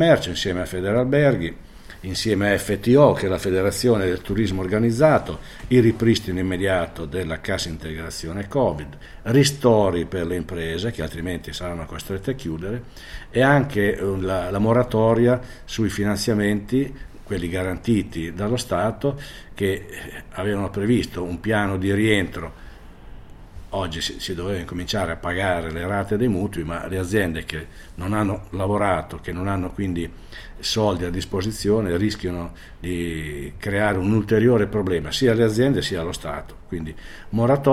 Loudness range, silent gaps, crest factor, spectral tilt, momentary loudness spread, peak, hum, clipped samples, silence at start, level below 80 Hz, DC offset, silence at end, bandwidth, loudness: 5 LU; none; 20 dB; -6 dB/octave; 14 LU; -2 dBFS; none; under 0.1%; 0 s; -40 dBFS; under 0.1%; 0 s; 16 kHz; -22 LUFS